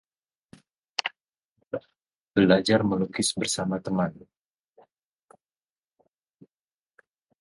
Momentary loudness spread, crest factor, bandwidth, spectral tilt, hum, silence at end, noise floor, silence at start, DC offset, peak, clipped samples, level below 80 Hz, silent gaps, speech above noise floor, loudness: 17 LU; 24 dB; 11.5 kHz; -4.5 dB/octave; none; 3.2 s; under -90 dBFS; 1 s; under 0.1%; -4 dBFS; under 0.1%; -60 dBFS; 1.45-1.56 s; over 66 dB; -26 LUFS